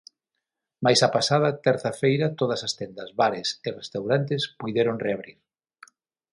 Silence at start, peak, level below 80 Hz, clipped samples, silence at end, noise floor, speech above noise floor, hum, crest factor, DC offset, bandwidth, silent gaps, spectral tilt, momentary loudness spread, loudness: 0.8 s; -4 dBFS; -66 dBFS; under 0.1%; 1 s; -83 dBFS; 59 dB; none; 22 dB; under 0.1%; 11.5 kHz; none; -4.5 dB/octave; 12 LU; -24 LUFS